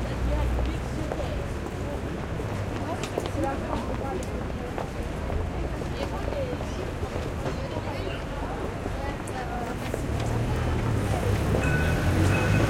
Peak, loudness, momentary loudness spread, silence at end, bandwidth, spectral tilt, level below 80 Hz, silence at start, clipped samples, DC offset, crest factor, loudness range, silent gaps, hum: -10 dBFS; -29 LUFS; 8 LU; 0 s; 16.5 kHz; -6.5 dB/octave; -34 dBFS; 0 s; under 0.1%; under 0.1%; 16 dB; 4 LU; none; none